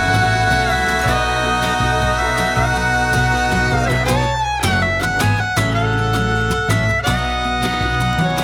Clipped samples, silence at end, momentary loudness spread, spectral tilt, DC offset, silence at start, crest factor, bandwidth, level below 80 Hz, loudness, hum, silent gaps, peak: under 0.1%; 0 s; 3 LU; -4.5 dB/octave; under 0.1%; 0 s; 14 dB; 18.5 kHz; -28 dBFS; -17 LUFS; none; none; -2 dBFS